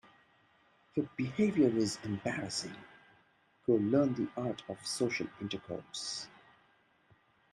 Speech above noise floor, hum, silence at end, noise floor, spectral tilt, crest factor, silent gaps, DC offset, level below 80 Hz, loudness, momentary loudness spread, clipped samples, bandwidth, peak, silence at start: 36 dB; none; 1.25 s; -69 dBFS; -5 dB/octave; 20 dB; none; under 0.1%; -72 dBFS; -34 LUFS; 12 LU; under 0.1%; 13 kHz; -16 dBFS; 0.95 s